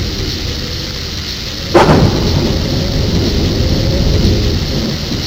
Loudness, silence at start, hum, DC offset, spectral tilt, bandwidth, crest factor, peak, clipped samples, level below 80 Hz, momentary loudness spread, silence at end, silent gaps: -14 LUFS; 0 s; none; under 0.1%; -5.5 dB/octave; 16 kHz; 14 dB; 0 dBFS; 0.1%; -20 dBFS; 10 LU; 0 s; none